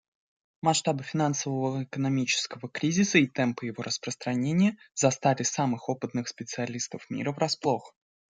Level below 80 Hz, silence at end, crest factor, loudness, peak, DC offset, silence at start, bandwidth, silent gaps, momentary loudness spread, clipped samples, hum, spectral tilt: -70 dBFS; 0.5 s; 22 dB; -28 LUFS; -8 dBFS; under 0.1%; 0.65 s; 9.8 kHz; none; 9 LU; under 0.1%; none; -4.5 dB/octave